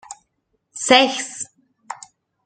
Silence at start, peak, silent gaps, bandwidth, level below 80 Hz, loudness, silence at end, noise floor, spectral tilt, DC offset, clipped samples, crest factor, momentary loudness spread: 0.1 s; 0 dBFS; none; 9.6 kHz; -68 dBFS; -17 LUFS; 0.5 s; -71 dBFS; -1 dB/octave; under 0.1%; under 0.1%; 22 dB; 25 LU